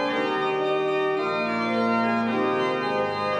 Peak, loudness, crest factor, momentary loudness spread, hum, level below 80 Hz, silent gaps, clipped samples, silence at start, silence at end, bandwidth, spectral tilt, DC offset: -12 dBFS; -24 LUFS; 12 dB; 2 LU; none; -68 dBFS; none; under 0.1%; 0 s; 0 s; 9.8 kHz; -6 dB/octave; under 0.1%